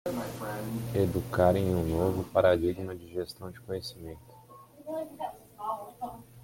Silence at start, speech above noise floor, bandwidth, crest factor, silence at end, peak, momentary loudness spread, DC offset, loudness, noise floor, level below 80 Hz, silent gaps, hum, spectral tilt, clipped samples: 0.05 s; 23 dB; 17 kHz; 22 dB; 0 s; -10 dBFS; 17 LU; under 0.1%; -31 LUFS; -53 dBFS; -54 dBFS; none; none; -7 dB/octave; under 0.1%